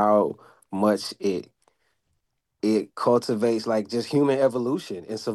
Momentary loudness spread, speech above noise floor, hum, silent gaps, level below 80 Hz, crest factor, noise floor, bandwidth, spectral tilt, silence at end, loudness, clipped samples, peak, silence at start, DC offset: 10 LU; 52 dB; none; none; -72 dBFS; 16 dB; -76 dBFS; 12.5 kHz; -6 dB/octave; 0 s; -24 LUFS; under 0.1%; -8 dBFS; 0 s; under 0.1%